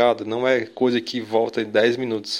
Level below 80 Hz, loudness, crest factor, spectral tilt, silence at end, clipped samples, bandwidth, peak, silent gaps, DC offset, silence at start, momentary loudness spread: -68 dBFS; -21 LUFS; 18 dB; -5 dB/octave; 0 s; under 0.1%; 13.5 kHz; -4 dBFS; none; under 0.1%; 0 s; 4 LU